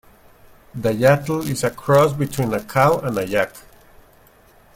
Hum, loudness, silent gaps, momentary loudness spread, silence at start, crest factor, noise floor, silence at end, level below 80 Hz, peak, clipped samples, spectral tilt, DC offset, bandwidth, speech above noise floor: none; -19 LUFS; none; 8 LU; 0.75 s; 18 dB; -51 dBFS; 1.15 s; -50 dBFS; -2 dBFS; under 0.1%; -6 dB/octave; under 0.1%; 16.5 kHz; 33 dB